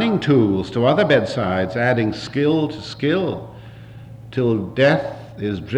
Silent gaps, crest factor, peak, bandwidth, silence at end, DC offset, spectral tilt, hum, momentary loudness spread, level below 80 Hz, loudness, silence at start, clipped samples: none; 16 dB; -4 dBFS; 10 kHz; 0 s; under 0.1%; -7 dB/octave; none; 20 LU; -50 dBFS; -19 LUFS; 0 s; under 0.1%